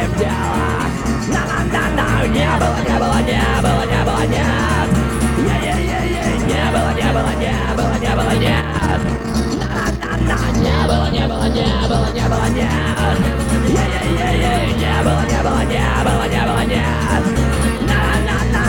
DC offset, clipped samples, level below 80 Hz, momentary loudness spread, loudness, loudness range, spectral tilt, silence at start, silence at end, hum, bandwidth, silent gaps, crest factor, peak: under 0.1%; under 0.1%; -22 dBFS; 3 LU; -16 LUFS; 1 LU; -5.5 dB/octave; 0 s; 0 s; none; 17.5 kHz; none; 14 dB; -2 dBFS